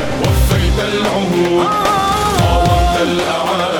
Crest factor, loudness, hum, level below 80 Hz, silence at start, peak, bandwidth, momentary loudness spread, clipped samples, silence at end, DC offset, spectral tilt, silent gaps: 12 dB; -14 LUFS; none; -22 dBFS; 0 s; -2 dBFS; 19.5 kHz; 3 LU; under 0.1%; 0 s; under 0.1%; -5 dB/octave; none